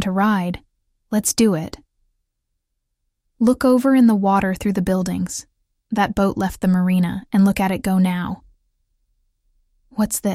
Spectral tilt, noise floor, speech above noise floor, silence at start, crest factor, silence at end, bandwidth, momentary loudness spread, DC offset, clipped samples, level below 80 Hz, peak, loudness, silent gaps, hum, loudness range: -6 dB/octave; -75 dBFS; 57 dB; 0 s; 14 dB; 0 s; 16 kHz; 12 LU; under 0.1%; under 0.1%; -46 dBFS; -6 dBFS; -19 LUFS; none; none; 4 LU